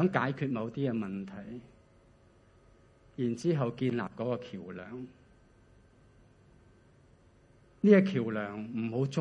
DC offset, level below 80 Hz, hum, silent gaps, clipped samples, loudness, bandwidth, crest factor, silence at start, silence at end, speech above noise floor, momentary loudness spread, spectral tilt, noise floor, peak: under 0.1%; -68 dBFS; none; none; under 0.1%; -31 LUFS; 9.6 kHz; 24 dB; 0 s; 0 s; 31 dB; 21 LU; -8 dB/octave; -62 dBFS; -10 dBFS